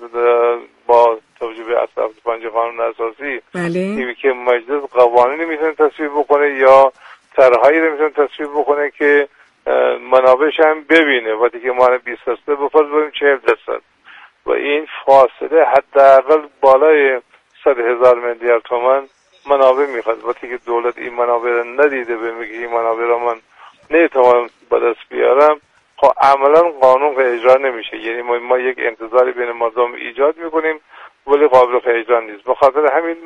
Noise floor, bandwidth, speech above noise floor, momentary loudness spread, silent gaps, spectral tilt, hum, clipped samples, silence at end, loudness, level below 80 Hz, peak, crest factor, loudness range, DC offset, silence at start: -43 dBFS; 8 kHz; 29 dB; 11 LU; none; -5.5 dB/octave; none; under 0.1%; 0 s; -14 LUFS; -58 dBFS; 0 dBFS; 14 dB; 6 LU; under 0.1%; 0 s